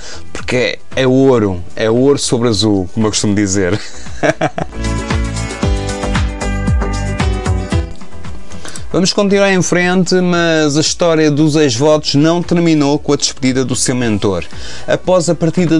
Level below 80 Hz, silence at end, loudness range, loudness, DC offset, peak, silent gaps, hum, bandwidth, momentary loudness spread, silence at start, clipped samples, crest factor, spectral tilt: -26 dBFS; 0 s; 6 LU; -13 LUFS; 5%; 0 dBFS; none; none; 11.5 kHz; 10 LU; 0 s; under 0.1%; 14 dB; -5 dB/octave